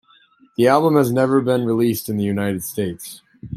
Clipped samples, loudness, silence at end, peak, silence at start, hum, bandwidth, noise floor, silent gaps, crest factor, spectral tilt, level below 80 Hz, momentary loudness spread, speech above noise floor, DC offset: under 0.1%; -18 LUFS; 0 s; 0 dBFS; 0.6 s; none; 16 kHz; -54 dBFS; none; 18 dB; -6.5 dB/octave; -58 dBFS; 17 LU; 36 dB; under 0.1%